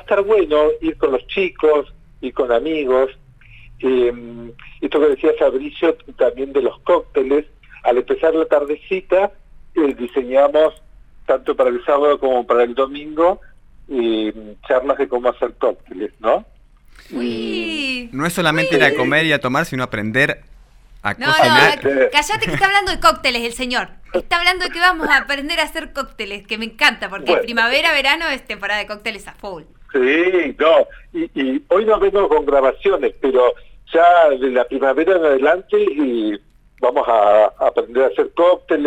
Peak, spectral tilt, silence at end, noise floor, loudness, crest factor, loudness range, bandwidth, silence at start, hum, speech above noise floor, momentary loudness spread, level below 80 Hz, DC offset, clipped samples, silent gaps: 0 dBFS; -4.5 dB/octave; 0 s; -44 dBFS; -17 LUFS; 16 dB; 5 LU; 17 kHz; 0.1 s; none; 27 dB; 11 LU; -42 dBFS; under 0.1%; under 0.1%; none